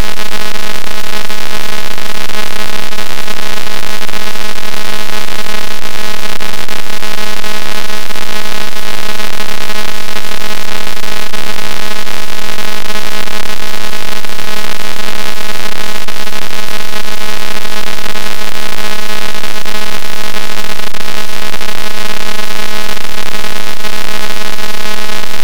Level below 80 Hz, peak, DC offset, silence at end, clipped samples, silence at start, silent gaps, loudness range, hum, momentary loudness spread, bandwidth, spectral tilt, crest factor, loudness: -40 dBFS; 0 dBFS; 100%; 0 s; 50%; 0 s; none; 0 LU; none; 1 LU; over 20 kHz; -3 dB/octave; 22 dB; -19 LUFS